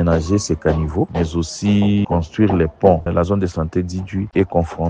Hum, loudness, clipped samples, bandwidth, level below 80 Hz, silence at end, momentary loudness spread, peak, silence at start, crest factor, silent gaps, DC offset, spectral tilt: none; -18 LUFS; under 0.1%; 9.6 kHz; -32 dBFS; 0 s; 6 LU; 0 dBFS; 0 s; 18 dB; none; under 0.1%; -7 dB/octave